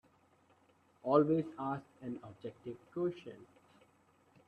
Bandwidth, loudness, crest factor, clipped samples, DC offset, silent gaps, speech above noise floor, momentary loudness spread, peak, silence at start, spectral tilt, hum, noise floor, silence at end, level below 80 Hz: 8.4 kHz; -37 LUFS; 24 dB; under 0.1%; under 0.1%; none; 33 dB; 20 LU; -14 dBFS; 1.05 s; -9.5 dB/octave; none; -70 dBFS; 1.05 s; -78 dBFS